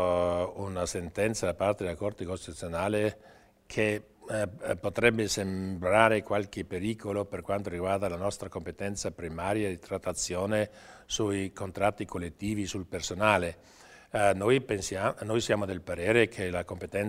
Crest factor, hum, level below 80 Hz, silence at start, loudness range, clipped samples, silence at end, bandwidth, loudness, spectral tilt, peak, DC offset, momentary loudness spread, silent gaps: 26 dB; none; -54 dBFS; 0 s; 4 LU; under 0.1%; 0 s; 16 kHz; -30 LUFS; -4.5 dB/octave; -4 dBFS; under 0.1%; 11 LU; none